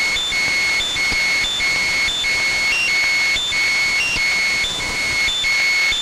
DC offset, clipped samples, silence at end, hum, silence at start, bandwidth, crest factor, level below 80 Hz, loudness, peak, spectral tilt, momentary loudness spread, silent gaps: under 0.1%; under 0.1%; 0 s; none; 0 s; 16 kHz; 10 dB; -40 dBFS; -16 LUFS; -8 dBFS; 0 dB/octave; 2 LU; none